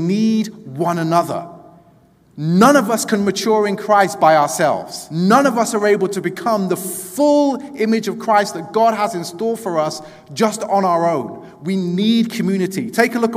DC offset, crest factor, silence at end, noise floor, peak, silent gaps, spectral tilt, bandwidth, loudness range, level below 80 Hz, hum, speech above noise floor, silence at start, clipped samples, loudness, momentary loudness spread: under 0.1%; 16 dB; 0 s; -51 dBFS; 0 dBFS; none; -5 dB/octave; 16 kHz; 4 LU; -64 dBFS; none; 34 dB; 0 s; under 0.1%; -17 LUFS; 11 LU